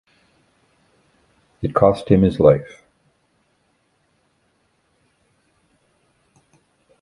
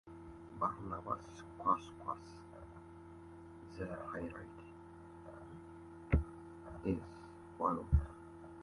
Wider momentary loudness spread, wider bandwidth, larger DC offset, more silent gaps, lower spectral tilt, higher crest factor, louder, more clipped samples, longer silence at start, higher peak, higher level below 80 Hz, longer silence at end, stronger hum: second, 13 LU vs 18 LU; about the same, 11 kHz vs 11.5 kHz; neither; neither; about the same, -9 dB/octave vs -8.5 dB/octave; about the same, 22 dB vs 24 dB; first, -17 LUFS vs -40 LUFS; neither; first, 1.6 s vs 0.05 s; first, 0 dBFS vs -18 dBFS; about the same, -44 dBFS vs -48 dBFS; first, 4.35 s vs 0 s; neither